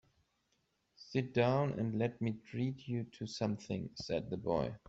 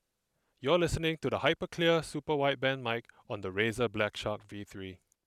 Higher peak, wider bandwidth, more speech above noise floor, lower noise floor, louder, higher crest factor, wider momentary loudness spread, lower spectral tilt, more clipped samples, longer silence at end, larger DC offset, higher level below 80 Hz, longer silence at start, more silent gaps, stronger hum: second, -18 dBFS vs -12 dBFS; second, 8 kHz vs 14.5 kHz; second, 43 dB vs 48 dB; about the same, -79 dBFS vs -80 dBFS; second, -37 LUFS vs -31 LUFS; about the same, 20 dB vs 22 dB; second, 9 LU vs 15 LU; first, -7 dB/octave vs -5 dB/octave; neither; second, 0.1 s vs 0.3 s; neither; second, -66 dBFS vs -54 dBFS; first, 1 s vs 0.6 s; neither; neither